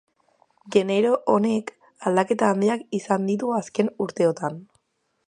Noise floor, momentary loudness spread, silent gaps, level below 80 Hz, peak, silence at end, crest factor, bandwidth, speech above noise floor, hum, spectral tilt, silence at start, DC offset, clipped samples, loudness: -72 dBFS; 9 LU; none; -70 dBFS; -4 dBFS; 0.65 s; 20 dB; 10.5 kHz; 50 dB; none; -6 dB/octave; 0.65 s; under 0.1%; under 0.1%; -23 LUFS